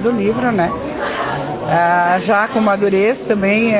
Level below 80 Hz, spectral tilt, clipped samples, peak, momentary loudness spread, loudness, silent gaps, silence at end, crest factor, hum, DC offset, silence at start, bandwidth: -46 dBFS; -10 dB/octave; under 0.1%; -2 dBFS; 7 LU; -16 LUFS; none; 0 s; 14 dB; none; under 0.1%; 0 s; 4 kHz